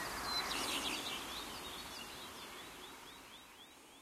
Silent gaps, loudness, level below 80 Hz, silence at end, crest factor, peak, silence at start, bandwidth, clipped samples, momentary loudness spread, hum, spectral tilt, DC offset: none; -41 LUFS; -64 dBFS; 0 s; 18 dB; -26 dBFS; 0 s; 16 kHz; under 0.1%; 17 LU; none; -1 dB/octave; under 0.1%